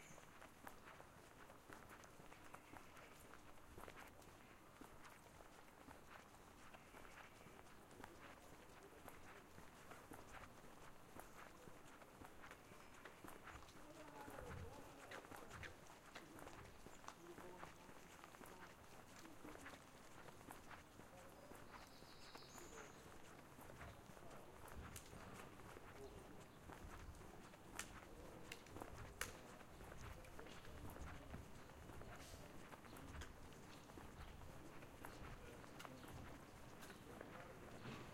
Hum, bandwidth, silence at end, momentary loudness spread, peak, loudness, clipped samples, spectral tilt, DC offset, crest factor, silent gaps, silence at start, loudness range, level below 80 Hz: none; 16 kHz; 0 s; 6 LU; -26 dBFS; -60 LUFS; under 0.1%; -4 dB/octave; under 0.1%; 32 dB; none; 0 s; 5 LU; -68 dBFS